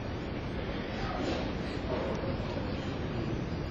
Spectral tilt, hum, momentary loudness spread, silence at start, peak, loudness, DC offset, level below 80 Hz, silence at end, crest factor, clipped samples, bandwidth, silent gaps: -7 dB/octave; none; 3 LU; 0 s; -20 dBFS; -35 LUFS; under 0.1%; -42 dBFS; 0 s; 14 dB; under 0.1%; 8.4 kHz; none